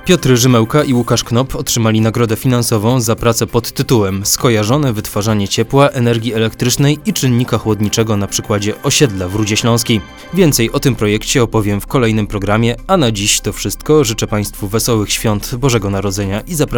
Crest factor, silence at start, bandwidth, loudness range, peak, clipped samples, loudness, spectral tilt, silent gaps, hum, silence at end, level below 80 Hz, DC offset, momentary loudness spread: 14 dB; 0 s; over 20 kHz; 1 LU; 0 dBFS; under 0.1%; -14 LUFS; -4.5 dB/octave; none; none; 0 s; -32 dBFS; under 0.1%; 6 LU